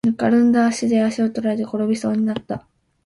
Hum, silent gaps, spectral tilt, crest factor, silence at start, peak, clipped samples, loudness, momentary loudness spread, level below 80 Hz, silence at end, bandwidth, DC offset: none; none; -6 dB/octave; 14 dB; 0.05 s; -6 dBFS; under 0.1%; -19 LUFS; 10 LU; -58 dBFS; 0.45 s; 11.5 kHz; under 0.1%